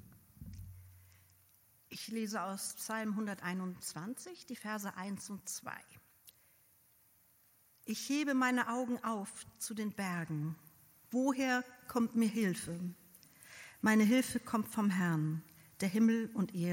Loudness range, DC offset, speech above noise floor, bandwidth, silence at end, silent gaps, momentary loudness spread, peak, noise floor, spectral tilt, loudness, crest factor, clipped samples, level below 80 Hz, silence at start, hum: 11 LU; under 0.1%; 33 dB; 17 kHz; 0 s; none; 19 LU; -18 dBFS; -69 dBFS; -5 dB/octave; -36 LUFS; 20 dB; under 0.1%; -72 dBFS; 0.1 s; none